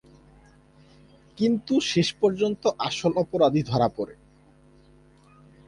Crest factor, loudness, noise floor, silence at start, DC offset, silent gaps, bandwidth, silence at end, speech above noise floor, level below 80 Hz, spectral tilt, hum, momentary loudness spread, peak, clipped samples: 18 dB; -24 LUFS; -56 dBFS; 1.4 s; under 0.1%; none; 11 kHz; 1.55 s; 32 dB; -58 dBFS; -5.5 dB/octave; none; 5 LU; -8 dBFS; under 0.1%